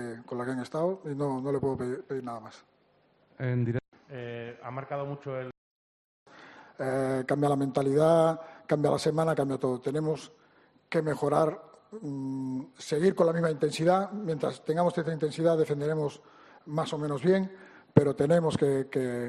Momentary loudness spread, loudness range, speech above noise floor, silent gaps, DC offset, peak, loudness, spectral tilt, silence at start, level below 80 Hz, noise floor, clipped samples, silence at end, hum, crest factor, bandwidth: 14 LU; 9 LU; 38 dB; 3.88-3.92 s, 5.58-6.26 s; under 0.1%; -4 dBFS; -29 LUFS; -7 dB/octave; 0 s; -68 dBFS; -66 dBFS; under 0.1%; 0 s; none; 24 dB; 12 kHz